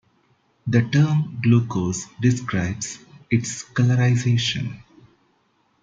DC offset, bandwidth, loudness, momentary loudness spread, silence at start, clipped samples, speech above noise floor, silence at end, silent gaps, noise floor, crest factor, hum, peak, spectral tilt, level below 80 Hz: under 0.1%; 8.8 kHz; -22 LUFS; 12 LU; 0.65 s; under 0.1%; 44 dB; 1 s; none; -65 dBFS; 18 dB; none; -4 dBFS; -5.5 dB/octave; -56 dBFS